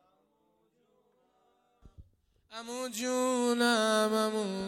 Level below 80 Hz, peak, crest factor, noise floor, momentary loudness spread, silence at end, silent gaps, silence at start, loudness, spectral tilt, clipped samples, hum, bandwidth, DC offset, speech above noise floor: -68 dBFS; -16 dBFS; 18 dB; -73 dBFS; 15 LU; 0 s; none; 1.85 s; -29 LUFS; -3 dB/octave; under 0.1%; none; 16.5 kHz; under 0.1%; 43 dB